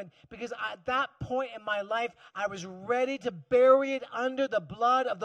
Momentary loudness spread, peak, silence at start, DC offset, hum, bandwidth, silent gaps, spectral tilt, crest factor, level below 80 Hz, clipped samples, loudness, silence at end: 13 LU; -10 dBFS; 0 s; under 0.1%; none; 8.6 kHz; none; -5 dB/octave; 20 dB; -64 dBFS; under 0.1%; -29 LUFS; 0 s